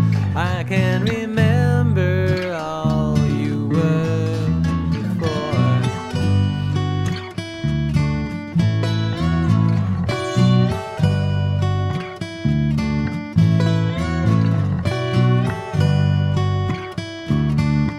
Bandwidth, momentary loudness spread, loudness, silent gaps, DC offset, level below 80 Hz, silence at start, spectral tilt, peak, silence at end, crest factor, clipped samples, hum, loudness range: 11.5 kHz; 6 LU; -19 LUFS; none; under 0.1%; -36 dBFS; 0 s; -7.5 dB/octave; -2 dBFS; 0 s; 16 dB; under 0.1%; none; 2 LU